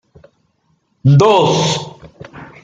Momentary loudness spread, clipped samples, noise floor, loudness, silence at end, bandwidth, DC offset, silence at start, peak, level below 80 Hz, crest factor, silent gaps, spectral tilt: 25 LU; under 0.1%; -62 dBFS; -12 LUFS; 0.2 s; 7.8 kHz; under 0.1%; 1.05 s; -2 dBFS; -52 dBFS; 14 dB; none; -5.5 dB/octave